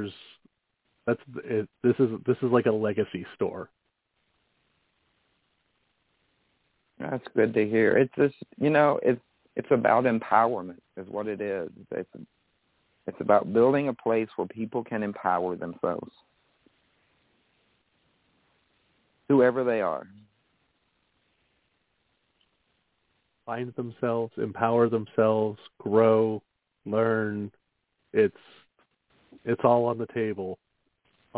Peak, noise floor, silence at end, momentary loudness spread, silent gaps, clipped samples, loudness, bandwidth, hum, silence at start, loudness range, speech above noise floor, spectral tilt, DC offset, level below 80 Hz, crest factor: -6 dBFS; -76 dBFS; 0 s; 15 LU; none; under 0.1%; -26 LUFS; 4 kHz; none; 0 s; 11 LU; 50 dB; -11 dB/octave; under 0.1%; -68 dBFS; 22 dB